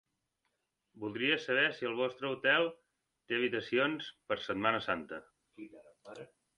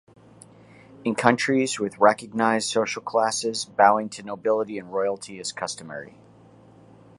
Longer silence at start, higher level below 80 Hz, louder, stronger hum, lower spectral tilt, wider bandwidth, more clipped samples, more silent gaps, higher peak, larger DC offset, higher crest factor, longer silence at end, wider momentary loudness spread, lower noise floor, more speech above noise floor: about the same, 0.95 s vs 1 s; second, -74 dBFS vs -68 dBFS; second, -33 LUFS vs -23 LUFS; neither; first, -5 dB/octave vs -3.5 dB/octave; about the same, 10.5 kHz vs 11.5 kHz; neither; neither; second, -14 dBFS vs 0 dBFS; neither; about the same, 22 dB vs 24 dB; second, 0.35 s vs 1.1 s; first, 23 LU vs 13 LU; first, -83 dBFS vs -51 dBFS; first, 49 dB vs 28 dB